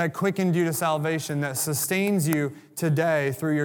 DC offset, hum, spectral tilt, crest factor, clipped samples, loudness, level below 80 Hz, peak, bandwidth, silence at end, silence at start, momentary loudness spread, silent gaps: under 0.1%; none; -5 dB/octave; 20 dB; under 0.1%; -25 LUFS; -72 dBFS; -4 dBFS; 19.5 kHz; 0 s; 0 s; 4 LU; none